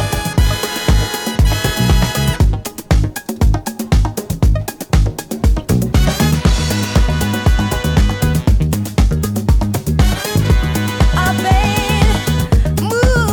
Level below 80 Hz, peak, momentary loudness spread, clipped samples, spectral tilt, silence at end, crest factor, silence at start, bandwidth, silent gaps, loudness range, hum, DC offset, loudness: -16 dBFS; 0 dBFS; 4 LU; under 0.1%; -5.5 dB/octave; 0 s; 14 dB; 0 s; 19.5 kHz; none; 2 LU; none; under 0.1%; -15 LUFS